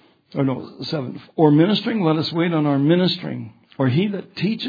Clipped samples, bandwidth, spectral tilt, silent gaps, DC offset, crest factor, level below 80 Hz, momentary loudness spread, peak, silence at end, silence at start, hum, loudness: under 0.1%; 5 kHz; -8.5 dB/octave; none; under 0.1%; 18 dB; -66 dBFS; 13 LU; -2 dBFS; 0 s; 0.35 s; none; -20 LUFS